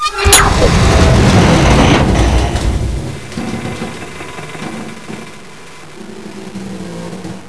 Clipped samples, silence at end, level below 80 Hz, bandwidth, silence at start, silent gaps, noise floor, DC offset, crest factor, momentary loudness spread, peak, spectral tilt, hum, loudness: under 0.1%; 0 s; -18 dBFS; 11 kHz; 0 s; none; -34 dBFS; 2%; 12 dB; 22 LU; 0 dBFS; -4.5 dB/octave; none; -10 LUFS